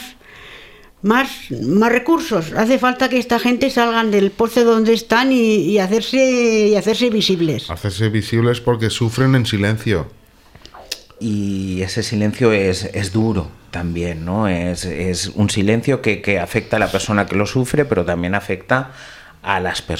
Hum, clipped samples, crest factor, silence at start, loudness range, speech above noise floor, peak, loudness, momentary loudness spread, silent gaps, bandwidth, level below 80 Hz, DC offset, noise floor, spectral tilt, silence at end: none; under 0.1%; 16 dB; 0 s; 5 LU; 28 dB; 0 dBFS; -17 LUFS; 9 LU; none; 16 kHz; -42 dBFS; under 0.1%; -44 dBFS; -5.5 dB/octave; 0 s